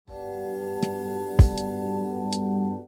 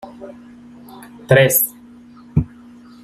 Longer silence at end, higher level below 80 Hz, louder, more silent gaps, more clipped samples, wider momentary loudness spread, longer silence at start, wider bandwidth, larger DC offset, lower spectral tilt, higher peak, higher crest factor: second, 0 s vs 0.6 s; first, -32 dBFS vs -42 dBFS; second, -26 LUFS vs -16 LUFS; neither; neither; second, 11 LU vs 27 LU; about the same, 0.1 s vs 0.05 s; first, 17.5 kHz vs 15.5 kHz; neither; first, -7 dB/octave vs -4.5 dB/octave; about the same, -4 dBFS vs -2 dBFS; about the same, 20 dB vs 18 dB